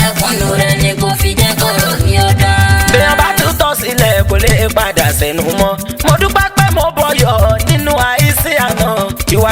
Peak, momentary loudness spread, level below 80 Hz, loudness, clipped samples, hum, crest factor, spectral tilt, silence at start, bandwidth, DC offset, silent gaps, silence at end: 0 dBFS; 4 LU; -22 dBFS; -11 LUFS; under 0.1%; none; 10 dB; -4 dB/octave; 0 s; over 20 kHz; under 0.1%; none; 0 s